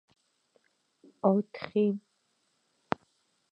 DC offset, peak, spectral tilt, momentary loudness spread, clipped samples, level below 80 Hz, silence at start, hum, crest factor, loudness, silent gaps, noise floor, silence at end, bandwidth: under 0.1%; -8 dBFS; -9 dB/octave; 10 LU; under 0.1%; -76 dBFS; 1.25 s; none; 26 dB; -31 LUFS; none; -75 dBFS; 1.55 s; 5.8 kHz